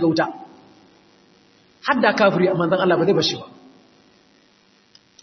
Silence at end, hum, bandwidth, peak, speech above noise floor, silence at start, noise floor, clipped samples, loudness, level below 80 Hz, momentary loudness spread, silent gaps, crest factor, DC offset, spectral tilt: 1.75 s; none; 6.4 kHz; -2 dBFS; 39 dB; 0 s; -57 dBFS; under 0.1%; -19 LUFS; -64 dBFS; 12 LU; none; 20 dB; under 0.1%; -5.5 dB/octave